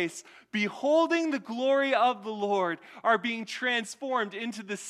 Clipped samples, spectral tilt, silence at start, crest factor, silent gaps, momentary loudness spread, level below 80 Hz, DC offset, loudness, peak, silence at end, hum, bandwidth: under 0.1%; -4 dB/octave; 0 s; 18 dB; none; 9 LU; -82 dBFS; under 0.1%; -28 LUFS; -12 dBFS; 0 s; none; 13.5 kHz